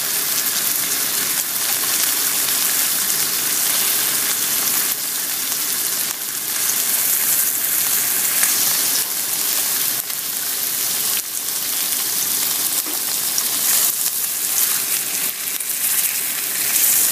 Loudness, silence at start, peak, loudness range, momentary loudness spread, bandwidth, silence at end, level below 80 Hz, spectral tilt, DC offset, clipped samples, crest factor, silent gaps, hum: -17 LUFS; 0 s; 0 dBFS; 2 LU; 5 LU; 16 kHz; 0 s; -70 dBFS; 1.5 dB/octave; under 0.1%; under 0.1%; 20 dB; none; none